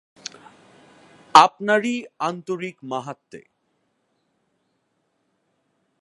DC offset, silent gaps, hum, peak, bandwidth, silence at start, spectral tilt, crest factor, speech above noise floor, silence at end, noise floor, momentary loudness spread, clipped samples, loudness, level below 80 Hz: under 0.1%; none; none; 0 dBFS; 11.5 kHz; 1.35 s; -3.5 dB/octave; 24 dB; 51 dB; 2.6 s; -71 dBFS; 24 LU; under 0.1%; -20 LUFS; -70 dBFS